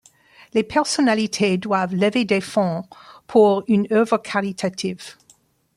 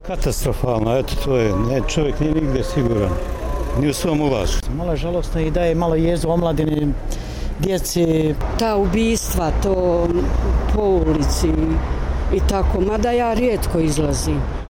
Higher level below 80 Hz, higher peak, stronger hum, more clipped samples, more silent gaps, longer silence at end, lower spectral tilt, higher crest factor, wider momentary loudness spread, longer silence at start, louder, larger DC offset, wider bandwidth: second, -62 dBFS vs -24 dBFS; about the same, -4 dBFS vs -6 dBFS; neither; neither; neither; first, 0.65 s vs 0 s; about the same, -5 dB/octave vs -6 dB/octave; first, 18 dB vs 12 dB; first, 12 LU vs 6 LU; first, 0.55 s vs 0 s; about the same, -20 LUFS vs -20 LUFS; neither; second, 12.5 kHz vs 17 kHz